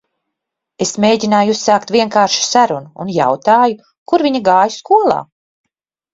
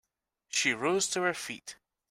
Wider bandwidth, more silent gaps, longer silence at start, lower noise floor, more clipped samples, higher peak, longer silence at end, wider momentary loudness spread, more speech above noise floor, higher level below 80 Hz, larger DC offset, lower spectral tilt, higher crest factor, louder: second, 7.8 kHz vs 16 kHz; first, 3.98-4.06 s vs none; first, 0.8 s vs 0.55 s; first, -78 dBFS vs -70 dBFS; neither; first, 0 dBFS vs -14 dBFS; first, 0.9 s vs 0.35 s; second, 8 LU vs 14 LU; first, 65 dB vs 39 dB; first, -58 dBFS vs -74 dBFS; neither; first, -3.5 dB/octave vs -2 dB/octave; second, 14 dB vs 20 dB; first, -13 LUFS vs -30 LUFS